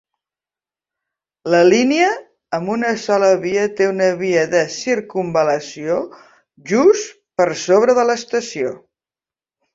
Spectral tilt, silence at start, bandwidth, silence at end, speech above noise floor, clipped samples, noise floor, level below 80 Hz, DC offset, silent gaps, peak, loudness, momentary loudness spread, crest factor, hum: -4.5 dB/octave; 1.45 s; 7.8 kHz; 0.95 s; over 74 dB; under 0.1%; under -90 dBFS; -62 dBFS; under 0.1%; none; -2 dBFS; -17 LUFS; 11 LU; 16 dB; none